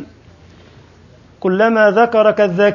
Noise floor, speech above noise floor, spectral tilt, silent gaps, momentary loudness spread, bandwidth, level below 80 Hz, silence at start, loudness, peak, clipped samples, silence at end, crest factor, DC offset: -45 dBFS; 33 dB; -7 dB/octave; none; 7 LU; 7 kHz; -52 dBFS; 0 s; -13 LUFS; 0 dBFS; under 0.1%; 0 s; 14 dB; under 0.1%